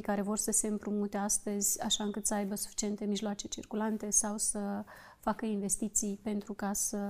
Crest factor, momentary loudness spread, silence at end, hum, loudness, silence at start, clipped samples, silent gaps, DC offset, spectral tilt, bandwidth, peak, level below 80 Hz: 20 dB; 9 LU; 0 s; none; -33 LUFS; 0 s; under 0.1%; none; under 0.1%; -3 dB/octave; 16 kHz; -14 dBFS; -58 dBFS